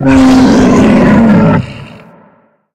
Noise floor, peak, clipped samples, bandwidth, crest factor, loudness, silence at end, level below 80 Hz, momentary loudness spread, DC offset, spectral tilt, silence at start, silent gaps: -47 dBFS; 0 dBFS; 0.1%; 10 kHz; 8 dB; -6 LUFS; 0.85 s; -28 dBFS; 7 LU; under 0.1%; -7 dB/octave; 0 s; none